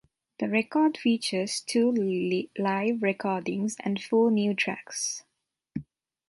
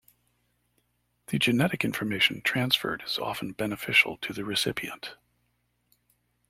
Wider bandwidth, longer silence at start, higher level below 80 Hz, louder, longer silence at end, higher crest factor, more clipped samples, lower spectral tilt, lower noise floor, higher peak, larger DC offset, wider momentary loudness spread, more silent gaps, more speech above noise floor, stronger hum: second, 11.5 kHz vs 16.5 kHz; second, 0.4 s vs 1.3 s; second, -70 dBFS vs -64 dBFS; about the same, -27 LUFS vs -26 LUFS; second, 0.45 s vs 1.35 s; second, 16 dB vs 24 dB; neither; about the same, -4.5 dB/octave vs -4 dB/octave; second, -47 dBFS vs -74 dBFS; second, -12 dBFS vs -6 dBFS; neither; second, 9 LU vs 12 LU; neither; second, 20 dB vs 46 dB; second, none vs 60 Hz at -55 dBFS